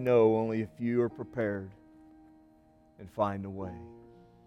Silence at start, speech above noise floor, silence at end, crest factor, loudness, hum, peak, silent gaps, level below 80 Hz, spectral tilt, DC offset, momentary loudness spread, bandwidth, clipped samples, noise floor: 0 s; 32 dB; 0.4 s; 20 dB; -31 LUFS; none; -14 dBFS; none; -64 dBFS; -9 dB/octave; under 0.1%; 23 LU; 6.4 kHz; under 0.1%; -62 dBFS